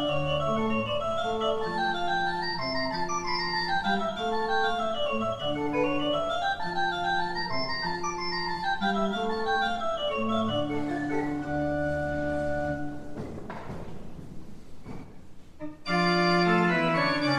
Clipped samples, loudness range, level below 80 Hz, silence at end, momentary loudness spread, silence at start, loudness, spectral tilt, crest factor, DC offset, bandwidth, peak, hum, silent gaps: under 0.1%; 5 LU; -50 dBFS; 0 s; 15 LU; 0 s; -28 LUFS; -5 dB/octave; 18 dB; under 0.1%; 12 kHz; -10 dBFS; none; none